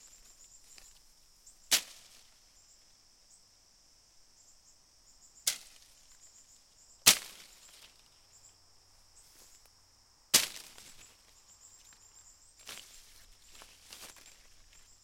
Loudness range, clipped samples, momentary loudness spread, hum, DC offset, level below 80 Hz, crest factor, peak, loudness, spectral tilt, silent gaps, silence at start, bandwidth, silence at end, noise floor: 20 LU; under 0.1%; 30 LU; none; under 0.1%; -68 dBFS; 38 dB; -2 dBFS; -28 LUFS; 1 dB/octave; none; 1.7 s; 16.5 kHz; 1 s; -65 dBFS